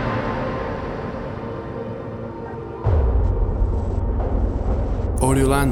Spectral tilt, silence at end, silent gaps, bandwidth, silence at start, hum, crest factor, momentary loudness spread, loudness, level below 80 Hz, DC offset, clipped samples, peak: -7 dB/octave; 0 s; none; 13.5 kHz; 0 s; none; 16 dB; 11 LU; -24 LUFS; -24 dBFS; under 0.1%; under 0.1%; -4 dBFS